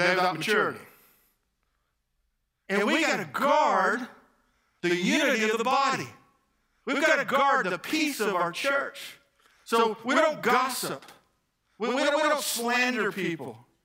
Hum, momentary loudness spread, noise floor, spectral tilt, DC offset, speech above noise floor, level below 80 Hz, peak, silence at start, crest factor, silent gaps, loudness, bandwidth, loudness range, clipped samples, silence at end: none; 11 LU; -76 dBFS; -3.5 dB/octave; under 0.1%; 50 dB; -76 dBFS; -8 dBFS; 0 s; 20 dB; none; -25 LUFS; 16 kHz; 3 LU; under 0.1%; 0.25 s